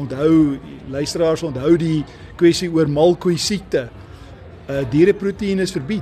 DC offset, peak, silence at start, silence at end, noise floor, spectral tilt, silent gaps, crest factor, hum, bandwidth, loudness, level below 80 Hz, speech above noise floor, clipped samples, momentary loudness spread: under 0.1%; -2 dBFS; 0 s; 0 s; -38 dBFS; -6 dB/octave; none; 16 dB; none; 13 kHz; -18 LUFS; -44 dBFS; 21 dB; under 0.1%; 11 LU